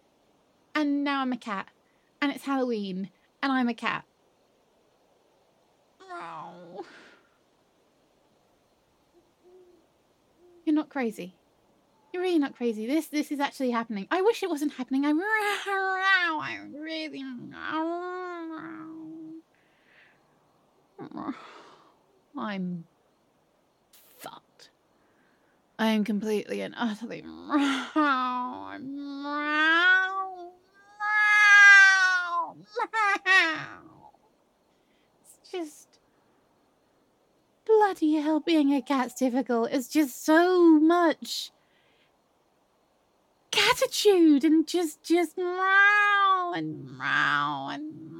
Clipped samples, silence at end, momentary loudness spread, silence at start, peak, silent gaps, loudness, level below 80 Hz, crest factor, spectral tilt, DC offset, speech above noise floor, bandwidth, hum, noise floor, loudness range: under 0.1%; 0 s; 21 LU; 0.75 s; -6 dBFS; none; -24 LUFS; -78 dBFS; 22 dB; -3.5 dB/octave; under 0.1%; 42 dB; 17 kHz; none; -68 dBFS; 24 LU